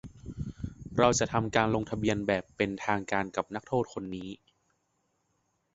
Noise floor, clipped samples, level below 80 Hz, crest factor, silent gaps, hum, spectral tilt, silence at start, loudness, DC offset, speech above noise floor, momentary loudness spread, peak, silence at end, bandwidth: -76 dBFS; under 0.1%; -52 dBFS; 24 dB; none; none; -5 dB/octave; 0.05 s; -30 LUFS; under 0.1%; 47 dB; 15 LU; -8 dBFS; 1.4 s; 8 kHz